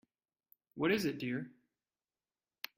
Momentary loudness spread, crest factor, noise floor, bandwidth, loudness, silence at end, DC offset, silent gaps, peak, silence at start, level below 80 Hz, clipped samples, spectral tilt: 19 LU; 20 dB; under -90 dBFS; 16 kHz; -36 LUFS; 1.3 s; under 0.1%; none; -20 dBFS; 0.75 s; -78 dBFS; under 0.1%; -5.5 dB/octave